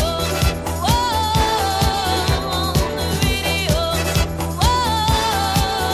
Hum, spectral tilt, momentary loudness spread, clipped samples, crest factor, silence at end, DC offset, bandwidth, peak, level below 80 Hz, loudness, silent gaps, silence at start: none; -4 dB/octave; 3 LU; under 0.1%; 16 dB; 0 s; under 0.1%; 16 kHz; -4 dBFS; -26 dBFS; -18 LUFS; none; 0 s